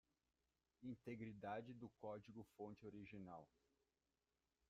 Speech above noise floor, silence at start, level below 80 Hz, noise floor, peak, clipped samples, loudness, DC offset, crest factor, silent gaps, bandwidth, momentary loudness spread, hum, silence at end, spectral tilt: over 34 dB; 0.8 s; -84 dBFS; under -90 dBFS; -38 dBFS; under 0.1%; -57 LUFS; under 0.1%; 20 dB; none; 7.4 kHz; 8 LU; none; 1.25 s; -6.5 dB/octave